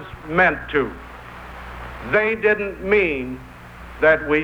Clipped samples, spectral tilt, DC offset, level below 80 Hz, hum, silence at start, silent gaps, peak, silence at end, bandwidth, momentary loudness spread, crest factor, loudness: under 0.1%; -7 dB/octave; under 0.1%; -42 dBFS; none; 0 s; none; -4 dBFS; 0 s; 8.8 kHz; 20 LU; 18 dB; -19 LUFS